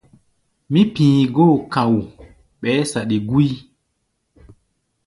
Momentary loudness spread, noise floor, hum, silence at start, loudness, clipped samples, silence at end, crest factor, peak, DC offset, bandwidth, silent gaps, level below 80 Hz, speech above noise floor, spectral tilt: 8 LU; -71 dBFS; none; 0.7 s; -17 LUFS; under 0.1%; 1.45 s; 16 dB; -2 dBFS; under 0.1%; 11.5 kHz; none; -50 dBFS; 55 dB; -7 dB/octave